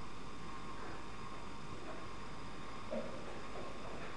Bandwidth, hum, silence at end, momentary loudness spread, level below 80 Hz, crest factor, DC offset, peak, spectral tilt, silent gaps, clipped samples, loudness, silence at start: 10.5 kHz; none; 0 s; 5 LU; -60 dBFS; 18 dB; 0.8%; -30 dBFS; -5 dB/octave; none; under 0.1%; -48 LUFS; 0 s